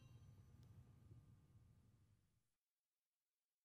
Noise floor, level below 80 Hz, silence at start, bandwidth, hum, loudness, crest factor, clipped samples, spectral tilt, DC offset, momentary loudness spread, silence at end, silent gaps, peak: under -90 dBFS; -80 dBFS; 0 s; 13 kHz; none; -68 LUFS; 16 dB; under 0.1%; -6.5 dB/octave; under 0.1%; 1 LU; 0.4 s; 2.58-2.92 s, 2.98-3.21 s; -54 dBFS